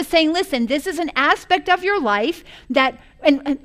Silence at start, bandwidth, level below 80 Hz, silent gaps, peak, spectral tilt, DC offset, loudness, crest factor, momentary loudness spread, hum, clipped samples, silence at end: 0 s; 15.5 kHz; -48 dBFS; none; -2 dBFS; -3 dB/octave; under 0.1%; -19 LUFS; 16 dB; 5 LU; none; under 0.1%; 0.05 s